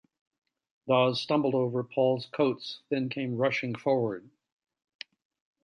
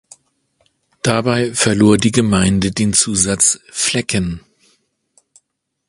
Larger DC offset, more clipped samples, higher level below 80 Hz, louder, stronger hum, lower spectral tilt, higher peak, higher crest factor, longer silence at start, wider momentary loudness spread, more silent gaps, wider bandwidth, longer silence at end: neither; neither; second, -76 dBFS vs -40 dBFS; second, -28 LUFS vs -15 LUFS; neither; first, -7 dB/octave vs -4 dB/octave; second, -12 dBFS vs 0 dBFS; about the same, 18 dB vs 18 dB; second, 0.85 s vs 1.05 s; first, 21 LU vs 8 LU; neither; second, 9.8 kHz vs 11.5 kHz; about the same, 1.45 s vs 1.5 s